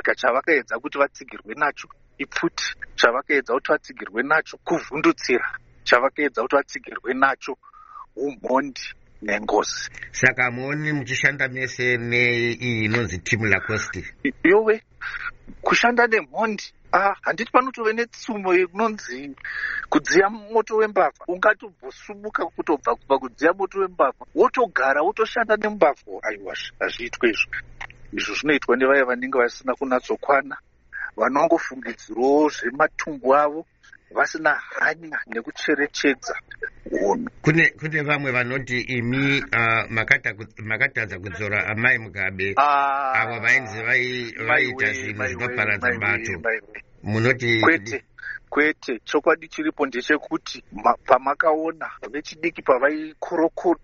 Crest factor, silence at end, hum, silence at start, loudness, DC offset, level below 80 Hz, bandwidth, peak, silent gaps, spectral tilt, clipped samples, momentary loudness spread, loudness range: 22 dB; 0.05 s; none; 0.05 s; -22 LUFS; under 0.1%; -52 dBFS; 7.6 kHz; 0 dBFS; none; -3 dB/octave; under 0.1%; 13 LU; 3 LU